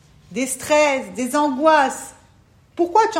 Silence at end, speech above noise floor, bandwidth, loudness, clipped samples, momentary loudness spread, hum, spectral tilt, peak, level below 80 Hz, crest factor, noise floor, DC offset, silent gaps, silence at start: 0 s; 35 dB; 16 kHz; -19 LUFS; under 0.1%; 17 LU; none; -3 dB/octave; -2 dBFS; -58 dBFS; 18 dB; -53 dBFS; under 0.1%; none; 0.3 s